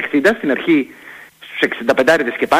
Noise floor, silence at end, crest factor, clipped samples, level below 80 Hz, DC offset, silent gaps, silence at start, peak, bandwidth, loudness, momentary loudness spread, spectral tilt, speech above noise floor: -36 dBFS; 0 s; 16 dB; under 0.1%; -56 dBFS; under 0.1%; none; 0 s; -2 dBFS; 16 kHz; -15 LUFS; 16 LU; -4.5 dB/octave; 22 dB